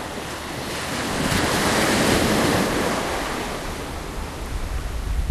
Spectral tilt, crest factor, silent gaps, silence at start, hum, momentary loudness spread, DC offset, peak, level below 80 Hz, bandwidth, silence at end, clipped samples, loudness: -4 dB/octave; 16 dB; none; 0 s; none; 13 LU; under 0.1%; -6 dBFS; -32 dBFS; 13.5 kHz; 0 s; under 0.1%; -23 LUFS